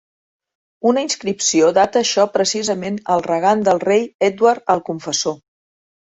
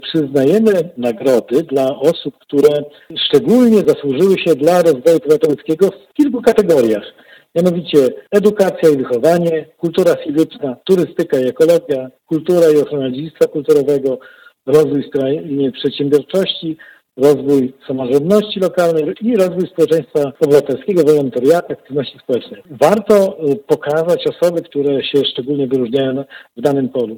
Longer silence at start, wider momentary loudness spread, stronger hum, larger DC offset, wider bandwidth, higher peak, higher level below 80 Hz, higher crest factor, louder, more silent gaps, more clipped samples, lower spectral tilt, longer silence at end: first, 0.85 s vs 0.05 s; about the same, 7 LU vs 9 LU; neither; neither; second, 8.2 kHz vs 19 kHz; about the same, 0 dBFS vs 0 dBFS; second, -62 dBFS vs -56 dBFS; about the same, 18 dB vs 14 dB; second, -17 LUFS vs -14 LUFS; first, 4.14-4.19 s vs none; neither; second, -3 dB/octave vs -6 dB/octave; first, 0.65 s vs 0 s